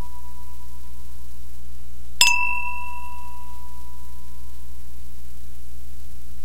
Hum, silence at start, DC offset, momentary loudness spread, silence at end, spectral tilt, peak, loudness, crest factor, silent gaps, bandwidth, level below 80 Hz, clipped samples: none; 0 s; 10%; 26 LU; 0 s; 0 dB/octave; 0 dBFS; -20 LUFS; 32 dB; none; 16 kHz; -40 dBFS; under 0.1%